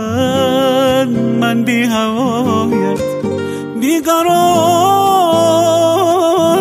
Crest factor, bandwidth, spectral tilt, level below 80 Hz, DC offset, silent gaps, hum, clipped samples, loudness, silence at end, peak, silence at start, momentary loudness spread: 12 dB; 15.5 kHz; -5 dB/octave; -50 dBFS; under 0.1%; none; none; under 0.1%; -13 LUFS; 0 s; 0 dBFS; 0 s; 7 LU